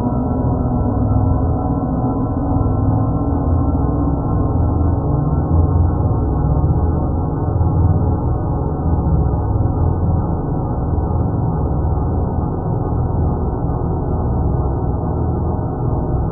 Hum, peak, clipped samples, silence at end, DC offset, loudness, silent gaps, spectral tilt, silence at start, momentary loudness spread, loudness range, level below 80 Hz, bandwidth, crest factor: none; -4 dBFS; under 0.1%; 0 s; under 0.1%; -18 LUFS; none; -15.5 dB/octave; 0 s; 4 LU; 2 LU; -22 dBFS; 1.6 kHz; 12 dB